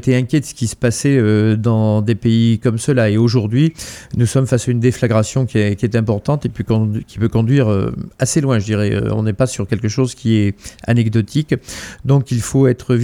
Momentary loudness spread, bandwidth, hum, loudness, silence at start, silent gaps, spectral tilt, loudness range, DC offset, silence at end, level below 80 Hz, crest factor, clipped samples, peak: 6 LU; 13.5 kHz; none; -16 LUFS; 0 s; none; -6.5 dB/octave; 3 LU; under 0.1%; 0 s; -42 dBFS; 14 dB; under 0.1%; -2 dBFS